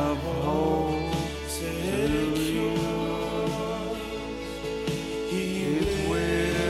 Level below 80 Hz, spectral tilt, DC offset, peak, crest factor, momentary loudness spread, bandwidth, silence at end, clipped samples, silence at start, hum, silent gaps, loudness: -40 dBFS; -5.5 dB/octave; under 0.1%; -14 dBFS; 14 dB; 7 LU; 16 kHz; 0 s; under 0.1%; 0 s; none; none; -28 LUFS